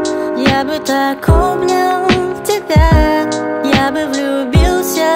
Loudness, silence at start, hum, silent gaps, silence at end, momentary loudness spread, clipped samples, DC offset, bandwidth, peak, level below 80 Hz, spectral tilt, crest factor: -13 LUFS; 0 s; none; none; 0 s; 6 LU; under 0.1%; under 0.1%; 16.5 kHz; 0 dBFS; -20 dBFS; -5.5 dB/octave; 12 dB